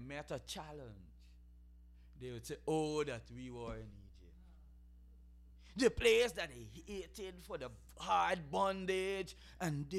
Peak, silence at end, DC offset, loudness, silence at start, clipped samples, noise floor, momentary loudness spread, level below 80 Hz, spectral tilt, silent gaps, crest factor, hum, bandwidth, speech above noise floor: -16 dBFS; 0 s; under 0.1%; -39 LUFS; 0 s; under 0.1%; -60 dBFS; 19 LU; -58 dBFS; -4.5 dB/octave; none; 24 dB; 60 Hz at -60 dBFS; 15 kHz; 21 dB